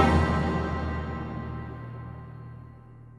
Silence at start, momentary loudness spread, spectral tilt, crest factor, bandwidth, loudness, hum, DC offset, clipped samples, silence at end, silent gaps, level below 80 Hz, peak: 0 s; 21 LU; -7.5 dB/octave; 22 dB; 10.5 kHz; -30 LUFS; none; under 0.1%; under 0.1%; 0 s; none; -36 dBFS; -6 dBFS